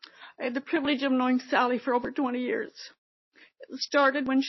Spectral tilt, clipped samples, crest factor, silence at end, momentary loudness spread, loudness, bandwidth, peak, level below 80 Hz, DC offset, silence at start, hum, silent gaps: -1 dB/octave; under 0.1%; 18 dB; 0 s; 18 LU; -27 LUFS; 6.2 kHz; -12 dBFS; -70 dBFS; under 0.1%; 0.2 s; none; 2.98-3.32 s